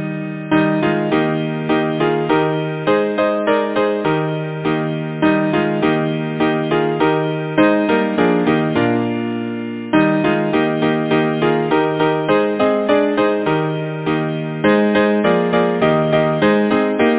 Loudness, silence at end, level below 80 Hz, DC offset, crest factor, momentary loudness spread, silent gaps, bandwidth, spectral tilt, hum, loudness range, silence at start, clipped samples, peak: -17 LUFS; 0 s; -50 dBFS; under 0.1%; 16 dB; 6 LU; none; 4 kHz; -10.5 dB/octave; none; 2 LU; 0 s; under 0.1%; 0 dBFS